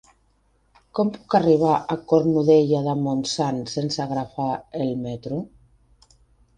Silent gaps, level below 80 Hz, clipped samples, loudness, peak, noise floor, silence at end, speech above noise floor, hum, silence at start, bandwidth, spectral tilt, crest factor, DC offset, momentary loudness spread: none; -58 dBFS; under 0.1%; -22 LUFS; -4 dBFS; -63 dBFS; 1.1 s; 42 dB; none; 0.95 s; 9.8 kHz; -6.5 dB/octave; 18 dB; under 0.1%; 12 LU